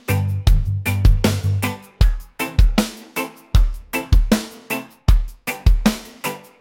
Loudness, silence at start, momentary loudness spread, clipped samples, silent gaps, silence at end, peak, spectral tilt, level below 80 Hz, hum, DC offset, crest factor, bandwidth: -21 LUFS; 0.1 s; 9 LU; under 0.1%; none; 0.25 s; -2 dBFS; -5.5 dB/octave; -20 dBFS; none; under 0.1%; 16 dB; 17 kHz